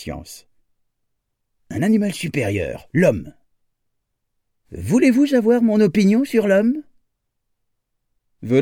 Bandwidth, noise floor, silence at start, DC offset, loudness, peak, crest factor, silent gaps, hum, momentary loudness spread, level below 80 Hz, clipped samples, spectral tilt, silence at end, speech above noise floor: 16 kHz; -73 dBFS; 0 s; under 0.1%; -18 LUFS; -4 dBFS; 18 dB; none; none; 15 LU; -50 dBFS; under 0.1%; -7 dB/octave; 0 s; 56 dB